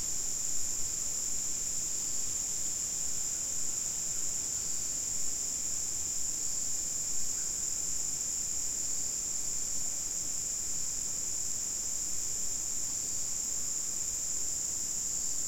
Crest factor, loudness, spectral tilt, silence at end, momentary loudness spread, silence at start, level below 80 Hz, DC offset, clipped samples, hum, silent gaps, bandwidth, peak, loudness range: 14 dB; -31 LUFS; 0 dB/octave; 0 s; 1 LU; 0 s; -56 dBFS; 0.7%; under 0.1%; none; none; 16.5 kHz; -18 dBFS; 1 LU